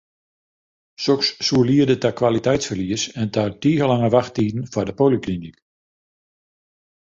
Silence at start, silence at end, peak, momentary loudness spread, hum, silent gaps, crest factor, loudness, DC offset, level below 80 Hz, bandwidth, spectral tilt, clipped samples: 1 s; 1.55 s; -2 dBFS; 8 LU; none; none; 18 dB; -20 LUFS; under 0.1%; -50 dBFS; 7.8 kHz; -5.5 dB/octave; under 0.1%